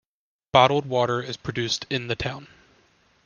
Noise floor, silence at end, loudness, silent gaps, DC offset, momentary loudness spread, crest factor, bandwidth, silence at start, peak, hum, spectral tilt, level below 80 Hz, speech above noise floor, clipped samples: -61 dBFS; 0.8 s; -23 LUFS; none; under 0.1%; 12 LU; 24 dB; 10 kHz; 0.55 s; -2 dBFS; none; -4.5 dB/octave; -54 dBFS; 38 dB; under 0.1%